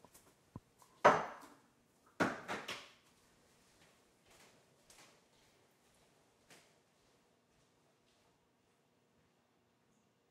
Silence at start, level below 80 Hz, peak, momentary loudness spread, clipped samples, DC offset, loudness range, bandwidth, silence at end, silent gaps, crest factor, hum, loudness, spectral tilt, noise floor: 0.55 s; -82 dBFS; -12 dBFS; 28 LU; under 0.1%; under 0.1%; 15 LU; 15.5 kHz; 7.45 s; none; 32 dB; none; -36 LUFS; -4 dB/octave; -76 dBFS